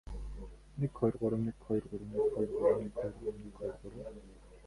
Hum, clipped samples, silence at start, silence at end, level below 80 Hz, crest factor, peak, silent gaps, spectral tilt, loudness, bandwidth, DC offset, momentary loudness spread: none; under 0.1%; 0.05 s; 0 s; -52 dBFS; 20 dB; -16 dBFS; none; -9.5 dB/octave; -36 LUFS; 11.5 kHz; under 0.1%; 17 LU